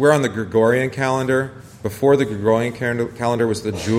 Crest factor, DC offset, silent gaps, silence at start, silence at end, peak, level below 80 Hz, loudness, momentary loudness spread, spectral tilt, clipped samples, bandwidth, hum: 16 dB; under 0.1%; none; 0 s; 0 s; -2 dBFS; -52 dBFS; -19 LUFS; 7 LU; -6 dB/octave; under 0.1%; 16 kHz; none